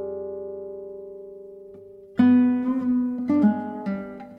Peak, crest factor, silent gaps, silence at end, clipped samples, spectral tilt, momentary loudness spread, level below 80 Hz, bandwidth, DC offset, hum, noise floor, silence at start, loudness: -6 dBFS; 18 dB; none; 0 s; under 0.1%; -9.5 dB/octave; 23 LU; -64 dBFS; 3.9 kHz; under 0.1%; none; -45 dBFS; 0 s; -23 LUFS